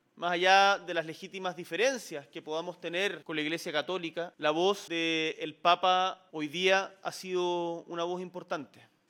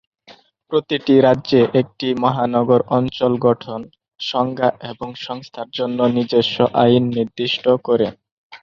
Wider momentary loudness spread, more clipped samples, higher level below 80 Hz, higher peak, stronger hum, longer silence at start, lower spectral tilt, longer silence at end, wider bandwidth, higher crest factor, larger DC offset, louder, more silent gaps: about the same, 13 LU vs 15 LU; neither; second, -88 dBFS vs -56 dBFS; second, -8 dBFS vs -2 dBFS; neither; second, 0.15 s vs 0.3 s; second, -3 dB/octave vs -7.5 dB/octave; first, 0.45 s vs 0.05 s; first, 17.5 kHz vs 7 kHz; first, 22 dB vs 16 dB; neither; second, -30 LUFS vs -17 LUFS; second, none vs 8.32-8.50 s